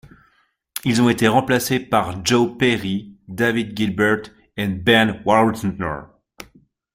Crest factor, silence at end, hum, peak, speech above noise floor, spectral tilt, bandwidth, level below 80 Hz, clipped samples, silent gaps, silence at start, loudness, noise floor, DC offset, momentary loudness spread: 18 dB; 0.5 s; none; -2 dBFS; 44 dB; -5 dB/octave; 16 kHz; -50 dBFS; under 0.1%; none; 0.75 s; -19 LUFS; -62 dBFS; under 0.1%; 12 LU